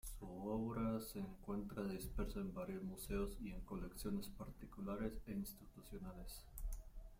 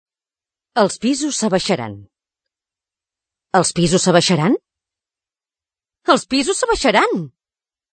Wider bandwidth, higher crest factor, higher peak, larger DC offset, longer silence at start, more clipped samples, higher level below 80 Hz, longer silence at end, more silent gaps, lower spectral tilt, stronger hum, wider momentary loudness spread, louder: first, 16.5 kHz vs 9.4 kHz; about the same, 16 dB vs 20 dB; second, -30 dBFS vs 0 dBFS; neither; second, 0.05 s vs 0.75 s; neither; second, -54 dBFS vs -48 dBFS; second, 0 s vs 0.65 s; neither; first, -6 dB/octave vs -4 dB/octave; neither; about the same, 11 LU vs 10 LU; second, -48 LUFS vs -17 LUFS